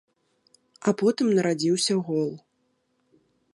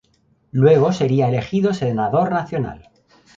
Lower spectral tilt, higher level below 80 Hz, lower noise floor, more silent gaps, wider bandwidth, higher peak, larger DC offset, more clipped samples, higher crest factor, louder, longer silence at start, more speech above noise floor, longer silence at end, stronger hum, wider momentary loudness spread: second, -5 dB/octave vs -8 dB/octave; second, -76 dBFS vs -50 dBFS; first, -72 dBFS vs -60 dBFS; neither; first, 11.5 kHz vs 7.6 kHz; second, -8 dBFS vs -2 dBFS; neither; neither; about the same, 18 dB vs 16 dB; second, -24 LUFS vs -18 LUFS; first, 0.85 s vs 0.55 s; first, 48 dB vs 43 dB; first, 1.2 s vs 0.65 s; neither; second, 7 LU vs 12 LU